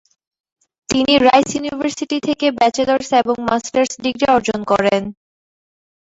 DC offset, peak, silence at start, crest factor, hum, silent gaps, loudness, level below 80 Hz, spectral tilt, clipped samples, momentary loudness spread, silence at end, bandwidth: under 0.1%; -2 dBFS; 0.9 s; 16 dB; none; none; -16 LUFS; -50 dBFS; -3.5 dB/octave; under 0.1%; 9 LU; 0.9 s; 8 kHz